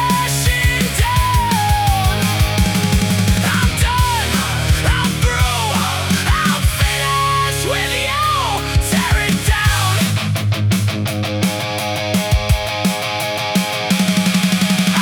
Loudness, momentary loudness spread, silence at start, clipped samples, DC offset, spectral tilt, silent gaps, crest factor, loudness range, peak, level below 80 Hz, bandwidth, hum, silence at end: -16 LUFS; 3 LU; 0 s; under 0.1%; under 0.1%; -4 dB/octave; none; 14 dB; 2 LU; -2 dBFS; -24 dBFS; 18 kHz; none; 0 s